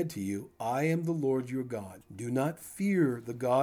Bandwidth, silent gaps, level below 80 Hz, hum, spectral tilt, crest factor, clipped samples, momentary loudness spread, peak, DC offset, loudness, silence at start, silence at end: over 20 kHz; none; -72 dBFS; none; -7 dB/octave; 16 dB; under 0.1%; 10 LU; -14 dBFS; under 0.1%; -32 LUFS; 0 s; 0 s